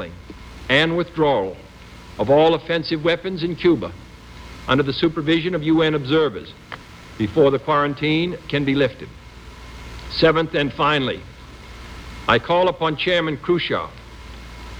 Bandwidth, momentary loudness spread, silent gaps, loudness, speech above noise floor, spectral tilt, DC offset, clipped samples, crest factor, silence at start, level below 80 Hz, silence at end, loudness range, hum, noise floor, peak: 10.5 kHz; 22 LU; none; -19 LUFS; 21 dB; -6.5 dB/octave; under 0.1%; under 0.1%; 18 dB; 0 s; -42 dBFS; 0 s; 2 LU; none; -40 dBFS; -2 dBFS